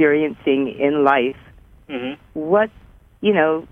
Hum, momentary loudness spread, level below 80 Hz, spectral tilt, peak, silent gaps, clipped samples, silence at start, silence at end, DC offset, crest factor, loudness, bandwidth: none; 13 LU; -52 dBFS; -8 dB/octave; -2 dBFS; none; under 0.1%; 0 s; 0.05 s; under 0.1%; 18 dB; -19 LUFS; 3.7 kHz